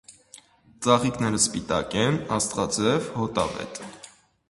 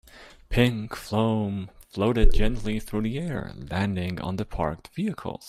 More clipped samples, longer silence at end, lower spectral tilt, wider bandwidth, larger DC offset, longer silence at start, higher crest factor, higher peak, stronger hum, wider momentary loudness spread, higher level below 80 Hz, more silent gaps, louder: neither; first, 0.4 s vs 0 s; second, -4 dB/octave vs -7 dB/octave; second, 11.5 kHz vs 13.5 kHz; neither; about the same, 0.1 s vs 0.15 s; about the same, 22 dB vs 20 dB; about the same, -4 dBFS vs -6 dBFS; neither; first, 14 LU vs 9 LU; second, -52 dBFS vs -30 dBFS; neither; first, -24 LUFS vs -28 LUFS